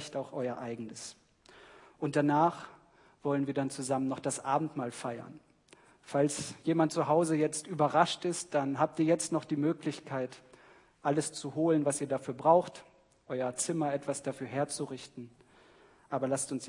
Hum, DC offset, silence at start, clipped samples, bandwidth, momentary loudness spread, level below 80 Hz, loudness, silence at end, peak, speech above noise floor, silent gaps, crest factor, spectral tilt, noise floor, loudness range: none; under 0.1%; 0 s; under 0.1%; 11 kHz; 14 LU; -76 dBFS; -32 LUFS; 0 s; -10 dBFS; 30 dB; none; 22 dB; -5 dB/octave; -62 dBFS; 5 LU